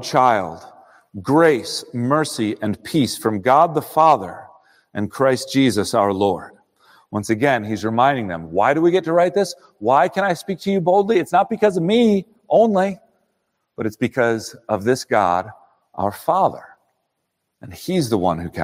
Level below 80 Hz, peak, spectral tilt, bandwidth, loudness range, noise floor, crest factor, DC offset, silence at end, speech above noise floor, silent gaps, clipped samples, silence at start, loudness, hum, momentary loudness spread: -60 dBFS; -2 dBFS; -5.5 dB/octave; 16 kHz; 4 LU; -75 dBFS; 18 dB; under 0.1%; 0 s; 57 dB; none; under 0.1%; 0 s; -19 LUFS; none; 12 LU